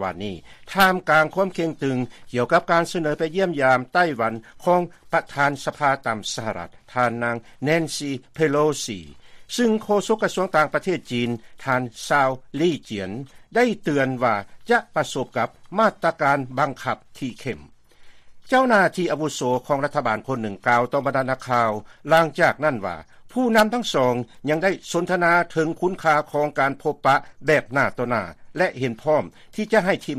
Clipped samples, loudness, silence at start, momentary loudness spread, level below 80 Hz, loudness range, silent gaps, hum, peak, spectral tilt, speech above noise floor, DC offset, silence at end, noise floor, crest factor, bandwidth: under 0.1%; -22 LUFS; 0 s; 11 LU; -56 dBFS; 3 LU; none; none; -4 dBFS; -5 dB/octave; 23 dB; under 0.1%; 0 s; -45 dBFS; 18 dB; 15 kHz